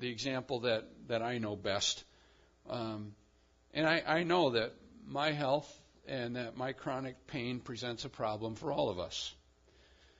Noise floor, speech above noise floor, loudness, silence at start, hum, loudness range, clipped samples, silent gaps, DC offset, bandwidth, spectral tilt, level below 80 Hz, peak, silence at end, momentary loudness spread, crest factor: -68 dBFS; 32 dB; -36 LUFS; 0 s; none; 5 LU; under 0.1%; none; under 0.1%; 7.4 kHz; -3 dB/octave; -68 dBFS; -16 dBFS; 0.85 s; 12 LU; 20 dB